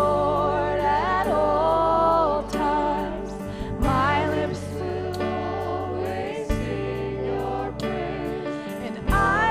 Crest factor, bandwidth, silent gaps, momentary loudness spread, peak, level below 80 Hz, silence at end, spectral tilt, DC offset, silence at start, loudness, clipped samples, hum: 14 dB; 15.5 kHz; none; 10 LU; -8 dBFS; -36 dBFS; 0 s; -6.5 dB/octave; under 0.1%; 0 s; -24 LUFS; under 0.1%; none